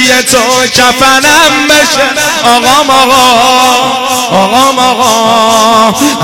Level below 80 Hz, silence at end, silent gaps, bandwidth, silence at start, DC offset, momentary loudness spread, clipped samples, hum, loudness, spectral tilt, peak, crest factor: -38 dBFS; 0 s; none; 18 kHz; 0 s; under 0.1%; 4 LU; 1%; none; -5 LUFS; -1.5 dB/octave; 0 dBFS; 6 dB